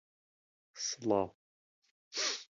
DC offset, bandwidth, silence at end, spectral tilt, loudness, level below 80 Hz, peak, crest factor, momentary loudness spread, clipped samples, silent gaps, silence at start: under 0.1%; 7.6 kHz; 0.1 s; -2 dB/octave; -36 LUFS; -72 dBFS; -16 dBFS; 24 dB; 9 LU; under 0.1%; 1.35-1.82 s, 1.91-2.11 s; 0.75 s